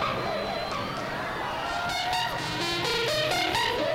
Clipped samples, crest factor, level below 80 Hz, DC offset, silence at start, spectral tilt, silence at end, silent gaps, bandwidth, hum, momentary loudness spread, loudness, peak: under 0.1%; 18 dB; -50 dBFS; under 0.1%; 0 s; -3 dB/octave; 0 s; none; 16.5 kHz; none; 6 LU; -28 LUFS; -10 dBFS